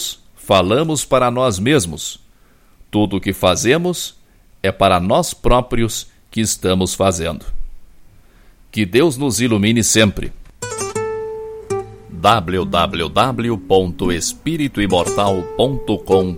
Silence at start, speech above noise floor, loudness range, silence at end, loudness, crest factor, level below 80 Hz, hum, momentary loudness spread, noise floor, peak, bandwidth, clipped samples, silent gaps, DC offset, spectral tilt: 0 s; 33 dB; 2 LU; 0 s; -17 LUFS; 18 dB; -34 dBFS; none; 12 LU; -49 dBFS; 0 dBFS; 16.5 kHz; under 0.1%; none; under 0.1%; -4.5 dB/octave